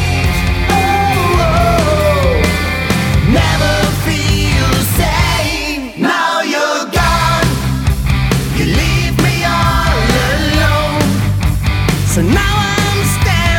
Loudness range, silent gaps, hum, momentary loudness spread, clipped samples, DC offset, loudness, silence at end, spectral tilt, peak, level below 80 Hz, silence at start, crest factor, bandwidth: 1 LU; none; none; 3 LU; under 0.1%; under 0.1%; -13 LUFS; 0 s; -5 dB/octave; 0 dBFS; -20 dBFS; 0 s; 12 dB; 19 kHz